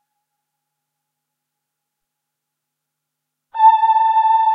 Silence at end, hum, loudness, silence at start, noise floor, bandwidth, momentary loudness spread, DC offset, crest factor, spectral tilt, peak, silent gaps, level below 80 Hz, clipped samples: 0 s; none; -13 LUFS; 3.55 s; -80 dBFS; 4.7 kHz; 4 LU; under 0.1%; 18 dB; 2 dB/octave; -2 dBFS; none; under -90 dBFS; under 0.1%